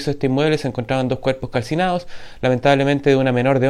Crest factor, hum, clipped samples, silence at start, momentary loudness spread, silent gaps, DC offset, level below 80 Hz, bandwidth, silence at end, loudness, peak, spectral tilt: 18 dB; none; under 0.1%; 0 s; 7 LU; none; under 0.1%; -44 dBFS; 12 kHz; 0 s; -19 LUFS; 0 dBFS; -7 dB/octave